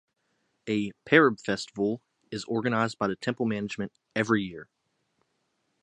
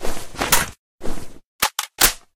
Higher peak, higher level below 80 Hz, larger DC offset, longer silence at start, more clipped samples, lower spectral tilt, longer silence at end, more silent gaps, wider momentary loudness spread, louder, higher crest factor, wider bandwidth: second, -4 dBFS vs 0 dBFS; second, -66 dBFS vs -32 dBFS; neither; first, 0.65 s vs 0 s; neither; first, -5.5 dB/octave vs -1 dB/octave; first, 1.2 s vs 0.2 s; second, none vs 0.79-0.99 s, 1.45-1.59 s; about the same, 17 LU vs 18 LU; second, -27 LUFS vs -20 LUFS; about the same, 24 dB vs 20 dB; second, 10.5 kHz vs 17.5 kHz